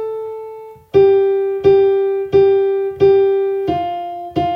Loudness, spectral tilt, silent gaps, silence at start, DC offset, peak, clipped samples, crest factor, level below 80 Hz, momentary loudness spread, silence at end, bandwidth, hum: -15 LUFS; -8.5 dB/octave; none; 0 s; under 0.1%; -2 dBFS; under 0.1%; 14 dB; -50 dBFS; 14 LU; 0 s; 5.2 kHz; none